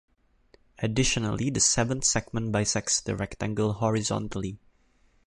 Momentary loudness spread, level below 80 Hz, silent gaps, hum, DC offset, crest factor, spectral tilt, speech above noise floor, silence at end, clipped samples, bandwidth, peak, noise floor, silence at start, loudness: 10 LU; -48 dBFS; none; none; under 0.1%; 20 dB; -3.5 dB/octave; 37 dB; 0.7 s; under 0.1%; 11.5 kHz; -8 dBFS; -64 dBFS; 0.8 s; -26 LUFS